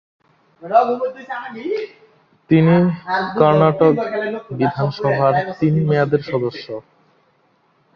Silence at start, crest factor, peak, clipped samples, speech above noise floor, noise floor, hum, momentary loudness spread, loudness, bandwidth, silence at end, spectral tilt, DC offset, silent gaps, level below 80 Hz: 0.6 s; 16 dB; -2 dBFS; under 0.1%; 43 dB; -60 dBFS; none; 14 LU; -17 LUFS; 6.2 kHz; 1.15 s; -9.5 dB/octave; under 0.1%; none; -56 dBFS